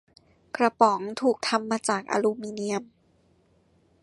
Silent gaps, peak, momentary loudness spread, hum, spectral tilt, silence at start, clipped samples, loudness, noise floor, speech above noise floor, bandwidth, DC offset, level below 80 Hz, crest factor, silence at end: none; -4 dBFS; 10 LU; none; -4 dB/octave; 0.55 s; under 0.1%; -26 LUFS; -64 dBFS; 39 dB; 11.5 kHz; under 0.1%; -72 dBFS; 22 dB; 1.15 s